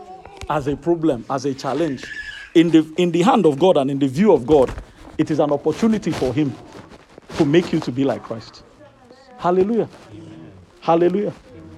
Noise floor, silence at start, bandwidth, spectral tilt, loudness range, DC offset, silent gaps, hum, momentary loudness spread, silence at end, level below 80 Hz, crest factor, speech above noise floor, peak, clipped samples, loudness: -46 dBFS; 0 s; 12 kHz; -7 dB/octave; 6 LU; under 0.1%; none; none; 18 LU; 0 s; -46 dBFS; 18 dB; 28 dB; -2 dBFS; under 0.1%; -19 LUFS